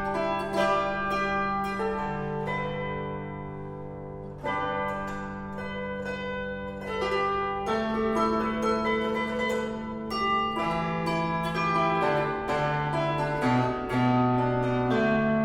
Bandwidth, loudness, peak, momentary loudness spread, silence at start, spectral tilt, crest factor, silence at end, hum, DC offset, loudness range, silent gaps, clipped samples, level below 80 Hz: 14.5 kHz; -28 LUFS; -12 dBFS; 10 LU; 0 s; -6.5 dB/octave; 16 dB; 0 s; none; under 0.1%; 7 LU; none; under 0.1%; -48 dBFS